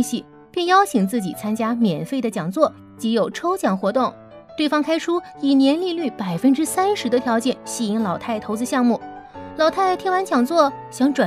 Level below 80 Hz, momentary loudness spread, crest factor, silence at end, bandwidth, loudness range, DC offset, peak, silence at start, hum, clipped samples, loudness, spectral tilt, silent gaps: -62 dBFS; 8 LU; 18 dB; 0 s; 15.5 kHz; 2 LU; under 0.1%; -2 dBFS; 0 s; none; under 0.1%; -20 LUFS; -5 dB/octave; none